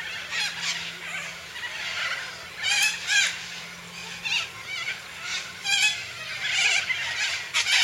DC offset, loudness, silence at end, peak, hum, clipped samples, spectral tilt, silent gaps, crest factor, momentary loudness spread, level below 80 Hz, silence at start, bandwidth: under 0.1%; -25 LUFS; 0 s; -8 dBFS; none; under 0.1%; 1.5 dB/octave; none; 20 dB; 13 LU; -66 dBFS; 0 s; 16.5 kHz